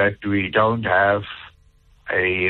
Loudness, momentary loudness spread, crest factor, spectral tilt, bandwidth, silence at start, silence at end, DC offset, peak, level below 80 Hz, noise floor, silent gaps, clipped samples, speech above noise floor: -20 LUFS; 18 LU; 16 dB; -8.5 dB/octave; 4.3 kHz; 0 s; 0 s; under 0.1%; -6 dBFS; -52 dBFS; -54 dBFS; none; under 0.1%; 35 dB